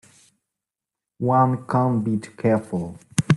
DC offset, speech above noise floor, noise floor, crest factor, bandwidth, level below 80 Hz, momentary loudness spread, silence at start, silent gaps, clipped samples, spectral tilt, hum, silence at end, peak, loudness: under 0.1%; 66 dB; -87 dBFS; 22 dB; 12 kHz; -58 dBFS; 9 LU; 1.2 s; none; under 0.1%; -7 dB/octave; none; 0 s; -2 dBFS; -22 LUFS